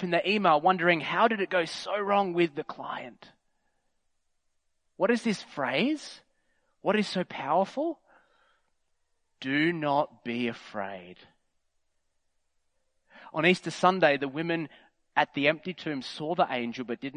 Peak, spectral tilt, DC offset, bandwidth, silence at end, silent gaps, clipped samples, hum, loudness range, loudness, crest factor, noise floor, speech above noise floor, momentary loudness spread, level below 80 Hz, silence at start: -6 dBFS; -5.5 dB/octave; under 0.1%; 10.5 kHz; 0.05 s; none; under 0.1%; none; 6 LU; -28 LUFS; 24 dB; -74 dBFS; 46 dB; 14 LU; -78 dBFS; 0 s